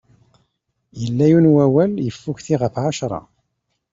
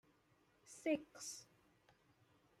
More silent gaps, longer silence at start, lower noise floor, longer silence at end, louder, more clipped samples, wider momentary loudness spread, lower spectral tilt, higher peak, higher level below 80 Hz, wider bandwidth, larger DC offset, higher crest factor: neither; first, 0.95 s vs 0.65 s; about the same, -73 dBFS vs -76 dBFS; second, 0.7 s vs 1.15 s; first, -17 LUFS vs -45 LUFS; neither; about the same, 15 LU vs 14 LU; first, -7.5 dB/octave vs -3 dB/octave; first, -4 dBFS vs -28 dBFS; first, -54 dBFS vs -86 dBFS; second, 7.8 kHz vs 14.5 kHz; neither; second, 16 dB vs 22 dB